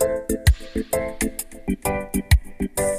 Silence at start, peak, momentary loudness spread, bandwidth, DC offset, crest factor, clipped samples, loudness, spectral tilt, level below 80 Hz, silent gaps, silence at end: 0 s; -4 dBFS; 6 LU; 15.5 kHz; under 0.1%; 18 dB; under 0.1%; -24 LUFS; -5 dB/octave; -26 dBFS; none; 0 s